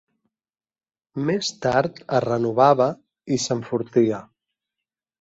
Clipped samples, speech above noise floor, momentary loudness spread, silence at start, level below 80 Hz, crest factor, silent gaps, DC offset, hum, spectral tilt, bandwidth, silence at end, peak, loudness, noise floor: under 0.1%; over 69 dB; 11 LU; 1.15 s; -60 dBFS; 20 dB; none; under 0.1%; none; -5.5 dB/octave; 8 kHz; 0.95 s; -4 dBFS; -22 LUFS; under -90 dBFS